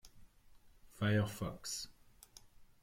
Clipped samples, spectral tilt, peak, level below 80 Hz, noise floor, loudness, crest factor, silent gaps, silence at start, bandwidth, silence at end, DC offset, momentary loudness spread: under 0.1%; -5 dB/octave; -22 dBFS; -64 dBFS; -62 dBFS; -38 LUFS; 20 dB; none; 0.05 s; 16.5 kHz; 0.2 s; under 0.1%; 25 LU